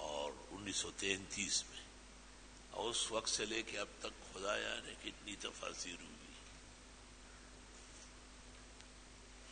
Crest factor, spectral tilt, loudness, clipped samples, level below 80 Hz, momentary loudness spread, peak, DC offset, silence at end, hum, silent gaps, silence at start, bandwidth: 26 dB; -1.5 dB/octave; -42 LUFS; under 0.1%; -62 dBFS; 20 LU; -20 dBFS; under 0.1%; 0 s; none; none; 0 s; 9.4 kHz